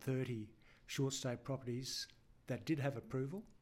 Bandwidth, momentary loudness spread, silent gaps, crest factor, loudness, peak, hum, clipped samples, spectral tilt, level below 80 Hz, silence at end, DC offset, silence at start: 16 kHz; 8 LU; none; 16 dB; -43 LUFS; -28 dBFS; none; under 0.1%; -5 dB/octave; -70 dBFS; 0.05 s; under 0.1%; 0 s